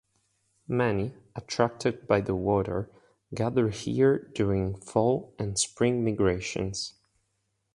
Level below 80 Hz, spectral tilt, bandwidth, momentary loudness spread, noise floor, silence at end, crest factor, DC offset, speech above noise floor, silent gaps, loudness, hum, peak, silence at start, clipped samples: -50 dBFS; -5.5 dB/octave; 11.5 kHz; 10 LU; -77 dBFS; 0.85 s; 20 dB; under 0.1%; 50 dB; none; -28 LUFS; none; -8 dBFS; 0.7 s; under 0.1%